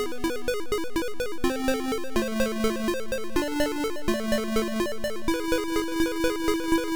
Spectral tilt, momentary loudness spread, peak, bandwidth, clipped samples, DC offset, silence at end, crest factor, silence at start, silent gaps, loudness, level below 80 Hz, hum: -4 dB/octave; 4 LU; -14 dBFS; over 20 kHz; under 0.1%; 1%; 0 s; 12 dB; 0 s; none; -28 LUFS; -40 dBFS; none